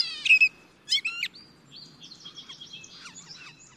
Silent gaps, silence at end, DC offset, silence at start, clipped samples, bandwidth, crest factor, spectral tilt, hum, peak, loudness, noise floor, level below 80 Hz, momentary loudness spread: none; 0.25 s; under 0.1%; 0 s; under 0.1%; 14.5 kHz; 20 dB; 1 dB/octave; none; -10 dBFS; -22 LUFS; -51 dBFS; -74 dBFS; 26 LU